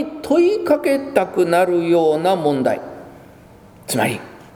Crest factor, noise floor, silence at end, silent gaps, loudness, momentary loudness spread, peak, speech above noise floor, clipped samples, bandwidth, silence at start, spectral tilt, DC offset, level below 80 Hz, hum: 18 dB; -44 dBFS; 0.1 s; none; -17 LUFS; 12 LU; 0 dBFS; 27 dB; under 0.1%; over 20 kHz; 0 s; -5.5 dB/octave; under 0.1%; -58 dBFS; none